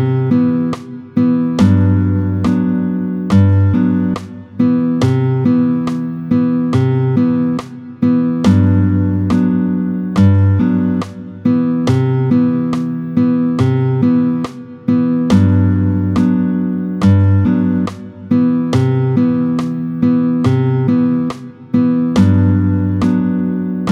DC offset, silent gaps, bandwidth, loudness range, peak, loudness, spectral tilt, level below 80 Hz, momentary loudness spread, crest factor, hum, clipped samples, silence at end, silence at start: under 0.1%; none; 8.4 kHz; 1 LU; 0 dBFS; -14 LUFS; -9 dB/octave; -46 dBFS; 7 LU; 14 dB; none; under 0.1%; 0 s; 0 s